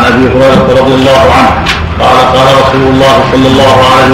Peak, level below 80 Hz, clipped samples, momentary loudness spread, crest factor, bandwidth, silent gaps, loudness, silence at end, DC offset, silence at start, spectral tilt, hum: 0 dBFS; -22 dBFS; 3%; 3 LU; 4 dB; 16 kHz; none; -5 LUFS; 0 s; 0.8%; 0 s; -5.5 dB/octave; none